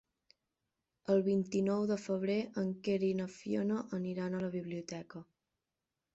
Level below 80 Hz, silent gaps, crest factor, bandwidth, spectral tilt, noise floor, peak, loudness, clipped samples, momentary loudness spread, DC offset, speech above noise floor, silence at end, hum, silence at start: -74 dBFS; none; 18 dB; 8 kHz; -7 dB/octave; -90 dBFS; -18 dBFS; -36 LUFS; under 0.1%; 12 LU; under 0.1%; 55 dB; 0.9 s; none; 1.1 s